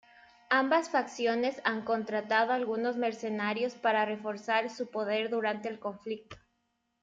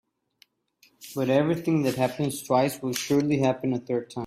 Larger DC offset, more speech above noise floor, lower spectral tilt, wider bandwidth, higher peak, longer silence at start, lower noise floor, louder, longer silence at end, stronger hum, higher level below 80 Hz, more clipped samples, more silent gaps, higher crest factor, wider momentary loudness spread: neither; first, 48 dB vs 39 dB; second, -4.5 dB/octave vs -6 dB/octave; second, 9 kHz vs 16 kHz; about the same, -12 dBFS vs -10 dBFS; second, 0.5 s vs 1 s; first, -79 dBFS vs -63 dBFS; second, -31 LUFS vs -25 LUFS; first, 0.65 s vs 0 s; neither; second, -76 dBFS vs -64 dBFS; neither; neither; about the same, 20 dB vs 16 dB; about the same, 9 LU vs 7 LU